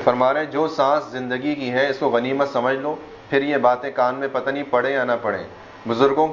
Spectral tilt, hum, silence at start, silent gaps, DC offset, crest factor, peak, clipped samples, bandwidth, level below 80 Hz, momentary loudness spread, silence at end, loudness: -6 dB/octave; none; 0 s; none; under 0.1%; 20 dB; 0 dBFS; under 0.1%; 7.4 kHz; -60 dBFS; 8 LU; 0 s; -21 LUFS